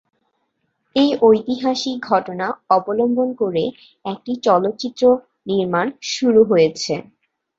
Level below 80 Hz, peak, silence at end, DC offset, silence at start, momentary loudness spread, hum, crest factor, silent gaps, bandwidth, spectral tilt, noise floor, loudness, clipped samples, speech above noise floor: -60 dBFS; -2 dBFS; 0.55 s; under 0.1%; 0.95 s; 11 LU; none; 16 dB; none; 7.8 kHz; -5 dB/octave; -70 dBFS; -18 LUFS; under 0.1%; 53 dB